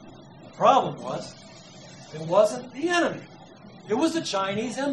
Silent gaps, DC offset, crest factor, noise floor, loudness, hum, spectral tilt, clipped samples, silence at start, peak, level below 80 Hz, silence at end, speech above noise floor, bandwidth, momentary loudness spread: none; under 0.1%; 20 dB; -47 dBFS; -25 LUFS; none; -4.5 dB/octave; under 0.1%; 0 s; -6 dBFS; -70 dBFS; 0 s; 22 dB; 12 kHz; 25 LU